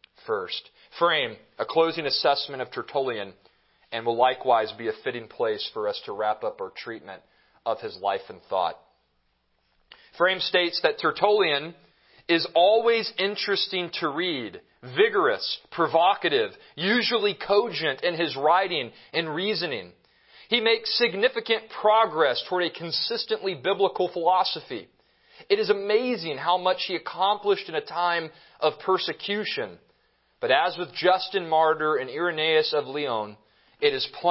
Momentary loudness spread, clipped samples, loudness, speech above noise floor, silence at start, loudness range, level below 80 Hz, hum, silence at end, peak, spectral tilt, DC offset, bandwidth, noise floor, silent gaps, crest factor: 11 LU; under 0.1%; -25 LUFS; 45 dB; 0.25 s; 5 LU; -72 dBFS; none; 0 s; -4 dBFS; -7.5 dB/octave; under 0.1%; 5.8 kHz; -70 dBFS; none; 22 dB